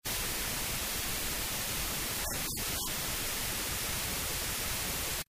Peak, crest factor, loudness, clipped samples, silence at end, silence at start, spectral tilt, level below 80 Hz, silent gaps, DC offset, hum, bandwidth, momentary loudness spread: -20 dBFS; 14 dB; -33 LUFS; under 0.1%; 0.1 s; 0.05 s; -1.5 dB/octave; -46 dBFS; none; under 0.1%; none; 16 kHz; 0 LU